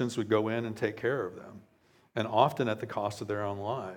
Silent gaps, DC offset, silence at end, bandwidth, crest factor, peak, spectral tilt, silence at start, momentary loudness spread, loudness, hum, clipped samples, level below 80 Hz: none; under 0.1%; 0 s; 17 kHz; 24 dB; -8 dBFS; -6 dB/octave; 0 s; 12 LU; -31 LUFS; none; under 0.1%; -74 dBFS